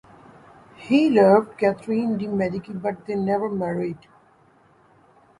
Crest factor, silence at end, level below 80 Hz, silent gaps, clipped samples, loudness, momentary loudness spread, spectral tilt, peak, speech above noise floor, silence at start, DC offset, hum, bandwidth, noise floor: 20 dB; 1.45 s; -62 dBFS; none; under 0.1%; -22 LUFS; 13 LU; -8 dB/octave; -4 dBFS; 36 dB; 0.8 s; under 0.1%; none; 11.5 kHz; -57 dBFS